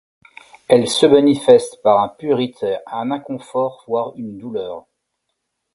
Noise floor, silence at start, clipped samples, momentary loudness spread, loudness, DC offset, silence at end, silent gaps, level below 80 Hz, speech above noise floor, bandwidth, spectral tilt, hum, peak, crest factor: -75 dBFS; 0.7 s; under 0.1%; 15 LU; -17 LUFS; under 0.1%; 0.95 s; none; -60 dBFS; 58 dB; 11.5 kHz; -5 dB/octave; none; 0 dBFS; 18 dB